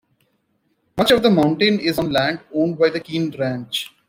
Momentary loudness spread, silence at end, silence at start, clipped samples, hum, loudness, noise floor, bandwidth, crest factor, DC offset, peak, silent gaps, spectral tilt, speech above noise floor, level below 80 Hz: 10 LU; 0.2 s; 0.95 s; under 0.1%; none; -19 LUFS; -67 dBFS; 16.5 kHz; 16 dB; under 0.1%; -2 dBFS; none; -5.5 dB/octave; 49 dB; -54 dBFS